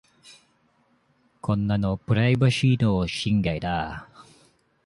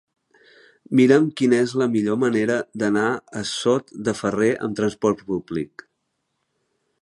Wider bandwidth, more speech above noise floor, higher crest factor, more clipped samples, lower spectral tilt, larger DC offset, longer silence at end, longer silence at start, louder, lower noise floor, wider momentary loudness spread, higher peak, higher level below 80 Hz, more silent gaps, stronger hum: about the same, 11.5 kHz vs 11.5 kHz; second, 43 dB vs 54 dB; about the same, 16 dB vs 20 dB; neither; about the same, -6.5 dB/octave vs -5.5 dB/octave; neither; second, 0.65 s vs 1.35 s; second, 0.25 s vs 0.9 s; second, -24 LUFS vs -21 LUFS; second, -65 dBFS vs -75 dBFS; about the same, 10 LU vs 10 LU; second, -8 dBFS vs -2 dBFS; first, -46 dBFS vs -60 dBFS; neither; neither